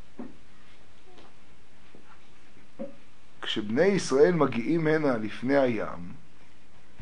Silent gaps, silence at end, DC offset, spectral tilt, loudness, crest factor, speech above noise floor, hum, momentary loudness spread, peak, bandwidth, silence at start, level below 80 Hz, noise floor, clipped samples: none; 0.85 s; 2%; -5.5 dB/octave; -26 LUFS; 20 dB; 33 dB; none; 22 LU; -8 dBFS; 10.5 kHz; 0.2 s; -66 dBFS; -58 dBFS; under 0.1%